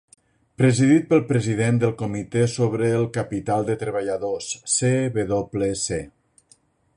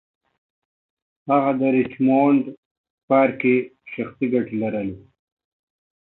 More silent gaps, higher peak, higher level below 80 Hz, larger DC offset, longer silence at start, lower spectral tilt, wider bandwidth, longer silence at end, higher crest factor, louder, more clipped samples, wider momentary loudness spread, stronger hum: second, none vs 2.58-2.84 s, 2.90-3.08 s; about the same, -6 dBFS vs -4 dBFS; first, -52 dBFS vs -62 dBFS; neither; second, 0.6 s vs 1.25 s; second, -5.5 dB/octave vs -11.5 dB/octave; first, 11 kHz vs 4 kHz; second, 0.9 s vs 1.1 s; about the same, 16 dB vs 18 dB; about the same, -22 LUFS vs -20 LUFS; neither; second, 9 LU vs 14 LU; neither